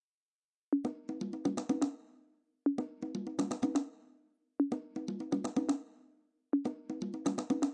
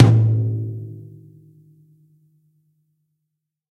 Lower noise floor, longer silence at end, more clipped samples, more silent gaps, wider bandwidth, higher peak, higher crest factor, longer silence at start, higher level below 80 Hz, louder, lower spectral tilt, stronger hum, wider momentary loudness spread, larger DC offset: first, under -90 dBFS vs -79 dBFS; second, 0 s vs 2.7 s; neither; neither; first, 10.5 kHz vs 5.6 kHz; second, -20 dBFS vs 0 dBFS; about the same, 18 dB vs 22 dB; first, 0.7 s vs 0 s; second, -82 dBFS vs -54 dBFS; second, -36 LUFS vs -19 LUFS; second, -6 dB/octave vs -9 dB/octave; neither; second, 7 LU vs 25 LU; neither